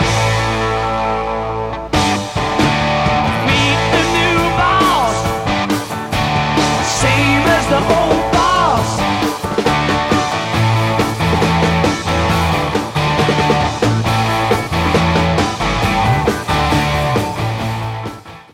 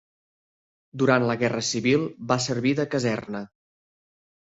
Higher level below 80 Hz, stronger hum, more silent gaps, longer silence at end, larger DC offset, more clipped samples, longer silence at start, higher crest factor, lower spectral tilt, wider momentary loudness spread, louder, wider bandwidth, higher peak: first, -30 dBFS vs -64 dBFS; neither; neither; second, 0.1 s vs 1.05 s; neither; neither; second, 0 s vs 0.95 s; second, 14 dB vs 20 dB; about the same, -5 dB/octave vs -5 dB/octave; second, 6 LU vs 14 LU; first, -15 LUFS vs -24 LUFS; first, 16.5 kHz vs 8 kHz; first, 0 dBFS vs -6 dBFS